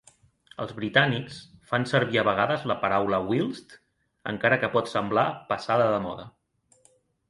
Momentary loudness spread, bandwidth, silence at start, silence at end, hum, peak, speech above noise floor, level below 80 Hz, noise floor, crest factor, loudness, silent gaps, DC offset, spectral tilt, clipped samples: 15 LU; 11.5 kHz; 0.6 s; 1 s; none; -4 dBFS; 39 dB; -60 dBFS; -64 dBFS; 24 dB; -25 LUFS; none; under 0.1%; -6 dB/octave; under 0.1%